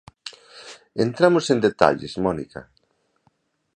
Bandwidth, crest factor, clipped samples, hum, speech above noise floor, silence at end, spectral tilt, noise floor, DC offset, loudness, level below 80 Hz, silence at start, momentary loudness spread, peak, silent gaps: 9.8 kHz; 24 dB; under 0.1%; none; 47 dB; 1.15 s; -5.5 dB/octave; -67 dBFS; under 0.1%; -20 LUFS; -54 dBFS; 0.25 s; 23 LU; 0 dBFS; none